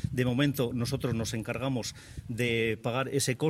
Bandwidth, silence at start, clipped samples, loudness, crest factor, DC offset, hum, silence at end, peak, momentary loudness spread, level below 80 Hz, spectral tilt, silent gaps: 16 kHz; 0 s; under 0.1%; -30 LUFS; 16 dB; under 0.1%; none; 0 s; -14 dBFS; 7 LU; -54 dBFS; -5 dB/octave; none